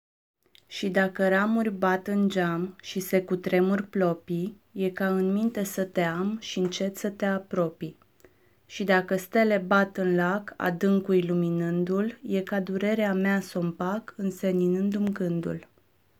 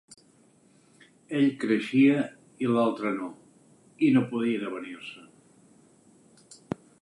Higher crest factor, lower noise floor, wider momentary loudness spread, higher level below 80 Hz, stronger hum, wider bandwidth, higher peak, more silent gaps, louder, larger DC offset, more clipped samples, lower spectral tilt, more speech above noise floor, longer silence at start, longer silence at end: about the same, 18 dB vs 18 dB; about the same, -60 dBFS vs -61 dBFS; second, 8 LU vs 18 LU; about the same, -70 dBFS vs -74 dBFS; neither; first, 16 kHz vs 11.5 kHz; about the same, -10 dBFS vs -12 dBFS; neither; about the same, -27 LUFS vs -26 LUFS; neither; neither; about the same, -6.5 dB/octave vs -7 dB/octave; about the same, 34 dB vs 35 dB; second, 0.7 s vs 1.3 s; second, 0.55 s vs 1.8 s